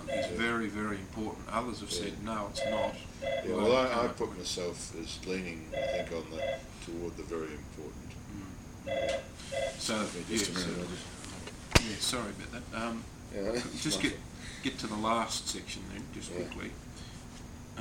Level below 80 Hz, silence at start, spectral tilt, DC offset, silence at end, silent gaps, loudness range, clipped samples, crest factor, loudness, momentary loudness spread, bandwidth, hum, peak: -50 dBFS; 0 s; -3.5 dB/octave; under 0.1%; 0 s; none; 6 LU; under 0.1%; 30 dB; -35 LUFS; 14 LU; 18 kHz; none; -6 dBFS